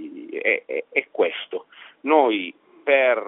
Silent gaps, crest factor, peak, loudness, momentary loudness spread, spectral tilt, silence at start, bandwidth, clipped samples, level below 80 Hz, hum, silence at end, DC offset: none; 20 dB; -2 dBFS; -22 LUFS; 15 LU; 0 dB/octave; 0 s; 4 kHz; under 0.1%; -78 dBFS; none; 0 s; under 0.1%